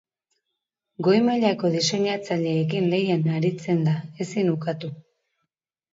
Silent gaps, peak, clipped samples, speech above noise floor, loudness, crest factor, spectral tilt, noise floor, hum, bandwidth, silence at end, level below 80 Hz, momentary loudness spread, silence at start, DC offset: none; -6 dBFS; under 0.1%; 60 dB; -23 LUFS; 18 dB; -6 dB/octave; -82 dBFS; none; 7.8 kHz; 0.95 s; -68 dBFS; 8 LU; 1 s; under 0.1%